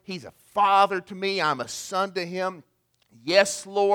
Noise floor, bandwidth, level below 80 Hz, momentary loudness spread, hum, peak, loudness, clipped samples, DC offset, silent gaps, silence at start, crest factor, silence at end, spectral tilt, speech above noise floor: -60 dBFS; 18 kHz; -72 dBFS; 12 LU; none; -4 dBFS; -24 LUFS; under 0.1%; under 0.1%; none; 0.1 s; 20 dB; 0 s; -3 dB/octave; 36 dB